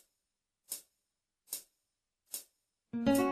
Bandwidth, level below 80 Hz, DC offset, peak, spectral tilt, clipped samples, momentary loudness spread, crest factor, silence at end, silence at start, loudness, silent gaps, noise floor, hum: 14 kHz; -68 dBFS; under 0.1%; -18 dBFS; -4 dB/octave; under 0.1%; 14 LU; 20 dB; 0 s; 0.7 s; -38 LUFS; none; -88 dBFS; none